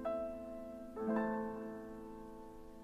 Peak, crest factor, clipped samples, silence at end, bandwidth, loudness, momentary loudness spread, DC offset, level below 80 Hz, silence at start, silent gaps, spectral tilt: -24 dBFS; 18 dB; under 0.1%; 0 s; 14.5 kHz; -43 LUFS; 15 LU; under 0.1%; -62 dBFS; 0 s; none; -8 dB/octave